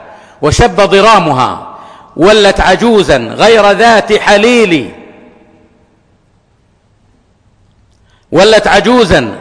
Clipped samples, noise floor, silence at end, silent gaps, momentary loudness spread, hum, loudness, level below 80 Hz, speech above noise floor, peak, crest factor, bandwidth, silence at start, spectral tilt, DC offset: 0.2%; -51 dBFS; 0 s; none; 9 LU; none; -7 LUFS; -28 dBFS; 44 dB; 0 dBFS; 8 dB; 10.5 kHz; 0 s; -4.5 dB/octave; under 0.1%